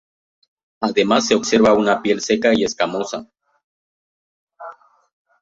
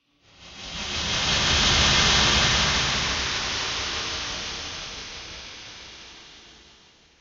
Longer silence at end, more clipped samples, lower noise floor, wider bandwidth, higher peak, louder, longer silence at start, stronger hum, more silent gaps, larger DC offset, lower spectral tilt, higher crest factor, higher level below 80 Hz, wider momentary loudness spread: about the same, 0.7 s vs 0.7 s; neither; second, -40 dBFS vs -55 dBFS; about the same, 8 kHz vs 8.2 kHz; first, -2 dBFS vs -8 dBFS; first, -17 LUFS vs -21 LUFS; first, 0.8 s vs 0.4 s; neither; first, 3.64-4.47 s vs none; neither; first, -4 dB/octave vs -1.5 dB/octave; about the same, 18 dB vs 18 dB; second, -56 dBFS vs -38 dBFS; about the same, 23 LU vs 22 LU